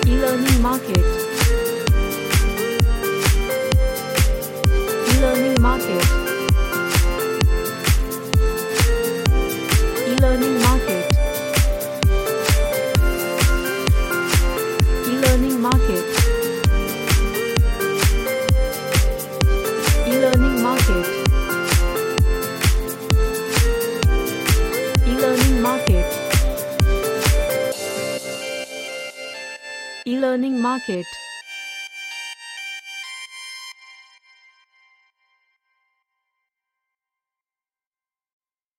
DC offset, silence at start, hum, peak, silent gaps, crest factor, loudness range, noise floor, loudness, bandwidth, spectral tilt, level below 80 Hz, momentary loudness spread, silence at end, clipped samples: under 0.1%; 0 s; none; 0 dBFS; none; 18 dB; 7 LU; under -90 dBFS; -19 LUFS; 17 kHz; -5 dB/octave; -22 dBFS; 13 LU; 4.85 s; under 0.1%